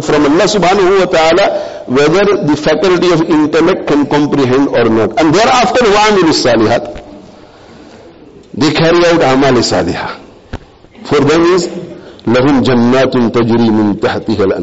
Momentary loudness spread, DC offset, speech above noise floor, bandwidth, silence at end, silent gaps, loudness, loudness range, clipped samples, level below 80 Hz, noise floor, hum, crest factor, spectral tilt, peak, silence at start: 13 LU; 0.9%; 27 dB; 8.2 kHz; 0 s; none; -10 LUFS; 3 LU; under 0.1%; -38 dBFS; -36 dBFS; none; 8 dB; -5 dB/octave; -2 dBFS; 0 s